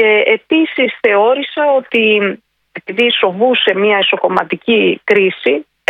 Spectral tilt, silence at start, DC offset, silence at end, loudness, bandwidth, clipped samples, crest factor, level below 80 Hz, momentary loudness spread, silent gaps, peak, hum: -6 dB/octave; 0 s; under 0.1%; 0.3 s; -12 LUFS; 6 kHz; under 0.1%; 12 dB; -62 dBFS; 5 LU; none; 0 dBFS; none